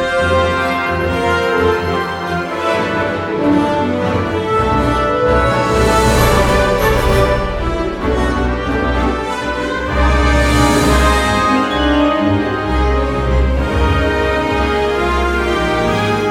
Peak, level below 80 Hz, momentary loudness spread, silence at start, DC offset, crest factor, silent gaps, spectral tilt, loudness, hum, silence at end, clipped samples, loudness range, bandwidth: 0 dBFS; -22 dBFS; 6 LU; 0 s; under 0.1%; 14 dB; none; -5.5 dB/octave; -15 LUFS; none; 0 s; under 0.1%; 3 LU; 16 kHz